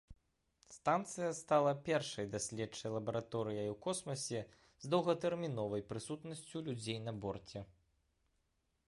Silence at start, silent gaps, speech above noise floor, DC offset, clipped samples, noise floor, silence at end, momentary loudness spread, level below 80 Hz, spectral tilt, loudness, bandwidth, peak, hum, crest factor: 0.1 s; none; 43 dB; under 0.1%; under 0.1%; -82 dBFS; 1.15 s; 12 LU; -70 dBFS; -5 dB/octave; -39 LUFS; 11.5 kHz; -20 dBFS; none; 20 dB